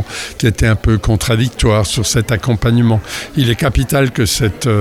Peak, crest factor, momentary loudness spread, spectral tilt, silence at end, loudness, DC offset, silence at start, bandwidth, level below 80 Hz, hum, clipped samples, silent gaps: 0 dBFS; 12 dB; 3 LU; -5 dB/octave; 0 s; -14 LUFS; under 0.1%; 0 s; 15.5 kHz; -26 dBFS; none; under 0.1%; none